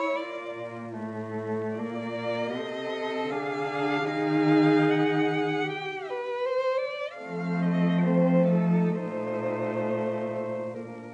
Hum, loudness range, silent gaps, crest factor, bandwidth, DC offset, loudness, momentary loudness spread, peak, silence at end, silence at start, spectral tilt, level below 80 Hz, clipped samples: none; 6 LU; none; 16 dB; 8 kHz; under 0.1%; -28 LUFS; 12 LU; -12 dBFS; 0 s; 0 s; -8 dB/octave; -84 dBFS; under 0.1%